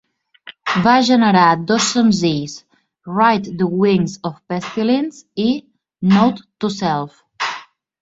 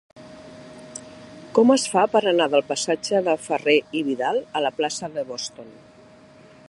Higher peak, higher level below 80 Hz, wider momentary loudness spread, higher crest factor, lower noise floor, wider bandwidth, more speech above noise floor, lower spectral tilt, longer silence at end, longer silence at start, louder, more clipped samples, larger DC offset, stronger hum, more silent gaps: about the same, -2 dBFS vs -2 dBFS; first, -56 dBFS vs -68 dBFS; second, 13 LU vs 23 LU; about the same, 16 dB vs 20 dB; second, -42 dBFS vs -49 dBFS; second, 8 kHz vs 11.5 kHz; about the same, 27 dB vs 28 dB; first, -5 dB/octave vs -3.5 dB/octave; second, 0.4 s vs 0.95 s; first, 0.45 s vs 0.15 s; first, -17 LUFS vs -21 LUFS; neither; neither; neither; neither